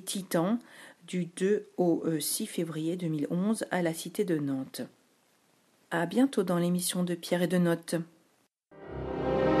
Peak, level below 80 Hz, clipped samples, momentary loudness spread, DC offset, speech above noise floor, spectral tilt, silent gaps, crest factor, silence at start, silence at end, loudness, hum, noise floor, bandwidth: -14 dBFS; -58 dBFS; under 0.1%; 13 LU; under 0.1%; 40 dB; -5.5 dB/octave; none; 18 dB; 0 s; 0 s; -30 LUFS; none; -70 dBFS; 14.5 kHz